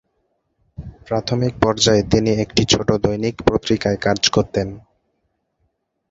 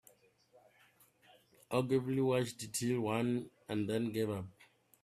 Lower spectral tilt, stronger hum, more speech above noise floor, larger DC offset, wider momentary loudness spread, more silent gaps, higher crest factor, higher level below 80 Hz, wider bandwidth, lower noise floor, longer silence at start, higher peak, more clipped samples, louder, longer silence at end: about the same, -4.5 dB/octave vs -5.5 dB/octave; neither; first, 53 dB vs 33 dB; neither; about the same, 9 LU vs 7 LU; neither; about the same, 20 dB vs 20 dB; first, -40 dBFS vs -74 dBFS; second, 8 kHz vs 15 kHz; about the same, -70 dBFS vs -68 dBFS; second, 0.8 s vs 1.7 s; first, 0 dBFS vs -18 dBFS; neither; first, -18 LUFS vs -36 LUFS; first, 1.3 s vs 0.5 s